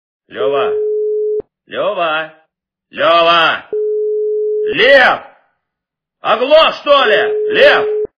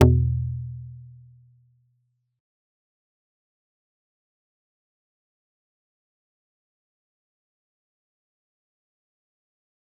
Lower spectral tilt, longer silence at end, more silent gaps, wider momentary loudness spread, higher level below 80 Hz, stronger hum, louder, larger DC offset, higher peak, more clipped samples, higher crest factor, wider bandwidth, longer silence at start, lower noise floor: second, -4 dB/octave vs -9 dB/octave; second, 0.15 s vs 8.95 s; neither; second, 12 LU vs 25 LU; second, -54 dBFS vs -44 dBFS; neither; first, -12 LUFS vs -25 LUFS; neither; about the same, 0 dBFS vs -2 dBFS; first, 0.2% vs under 0.1%; second, 14 dB vs 28 dB; first, 5.4 kHz vs 3.8 kHz; first, 0.3 s vs 0 s; first, -80 dBFS vs -72 dBFS